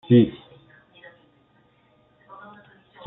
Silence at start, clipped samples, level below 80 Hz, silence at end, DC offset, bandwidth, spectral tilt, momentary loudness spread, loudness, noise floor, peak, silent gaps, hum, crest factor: 0.1 s; under 0.1%; -62 dBFS; 2.75 s; under 0.1%; 4 kHz; -8 dB/octave; 31 LU; -20 LUFS; -61 dBFS; -6 dBFS; none; none; 20 dB